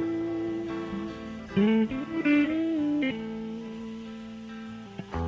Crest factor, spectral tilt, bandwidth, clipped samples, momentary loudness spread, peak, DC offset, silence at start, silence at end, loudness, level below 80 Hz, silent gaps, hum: 16 dB; -7.5 dB/octave; 7.6 kHz; under 0.1%; 16 LU; -12 dBFS; under 0.1%; 0 s; 0 s; -29 LUFS; -50 dBFS; none; none